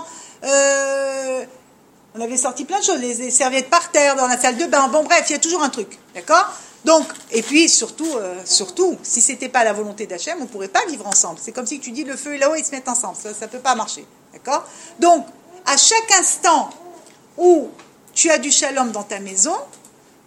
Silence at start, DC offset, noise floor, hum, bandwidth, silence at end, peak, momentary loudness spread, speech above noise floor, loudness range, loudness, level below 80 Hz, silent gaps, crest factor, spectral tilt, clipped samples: 0 s; under 0.1%; -51 dBFS; none; 16 kHz; 0.6 s; 0 dBFS; 14 LU; 33 dB; 5 LU; -17 LUFS; -72 dBFS; none; 18 dB; -0.5 dB/octave; under 0.1%